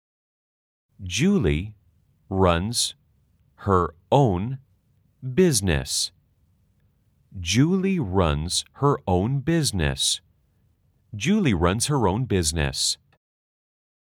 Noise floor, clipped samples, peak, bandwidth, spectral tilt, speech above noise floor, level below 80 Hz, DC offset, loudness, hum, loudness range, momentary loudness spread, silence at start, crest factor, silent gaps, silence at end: -64 dBFS; under 0.1%; -4 dBFS; 18.5 kHz; -4.5 dB/octave; 42 dB; -42 dBFS; under 0.1%; -23 LUFS; none; 2 LU; 11 LU; 1 s; 20 dB; none; 1.15 s